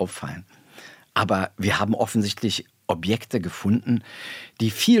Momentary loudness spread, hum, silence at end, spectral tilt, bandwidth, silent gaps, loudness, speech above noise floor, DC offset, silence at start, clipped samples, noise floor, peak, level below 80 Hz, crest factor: 14 LU; none; 0 s; -5 dB/octave; 16.5 kHz; none; -24 LUFS; 24 dB; under 0.1%; 0 s; under 0.1%; -47 dBFS; -6 dBFS; -62 dBFS; 18 dB